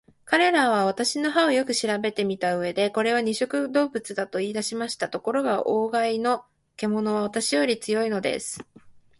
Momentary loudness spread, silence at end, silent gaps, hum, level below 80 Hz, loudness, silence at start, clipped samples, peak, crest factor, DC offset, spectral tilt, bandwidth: 8 LU; 0.2 s; none; none; -68 dBFS; -24 LUFS; 0.25 s; under 0.1%; -8 dBFS; 18 dB; under 0.1%; -3.5 dB/octave; 11.5 kHz